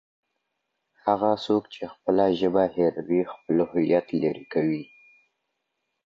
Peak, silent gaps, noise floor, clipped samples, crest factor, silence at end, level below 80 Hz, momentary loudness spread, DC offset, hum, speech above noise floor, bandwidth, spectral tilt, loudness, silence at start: -8 dBFS; none; -79 dBFS; under 0.1%; 18 dB; 1.25 s; -62 dBFS; 6 LU; under 0.1%; none; 55 dB; 7.4 kHz; -8 dB/octave; -25 LUFS; 1.05 s